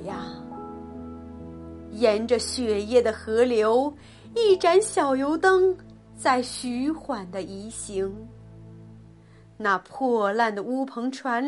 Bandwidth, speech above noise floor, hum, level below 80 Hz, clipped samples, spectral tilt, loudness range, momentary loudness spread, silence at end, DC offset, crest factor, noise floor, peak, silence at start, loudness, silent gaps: 11.5 kHz; 27 dB; none; -54 dBFS; under 0.1%; -4 dB/octave; 8 LU; 19 LU; 0 s; under 0.1%; 18 dB; -51 dBFS; -8 dBFS; 0 s; -24 LUFS; none